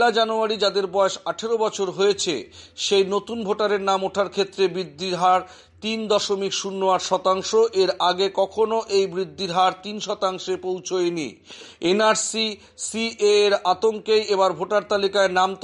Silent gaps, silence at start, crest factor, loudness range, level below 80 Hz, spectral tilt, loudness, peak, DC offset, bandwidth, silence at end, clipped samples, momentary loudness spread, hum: none; 0 s; 16 dB; 3 LU; -64 dBFS; -3 dB/octave; -22 LUFS; -6 dBFS; under 0.1%; 11.5 kHz; 0.05 s; under 0.1%; 9 LU; none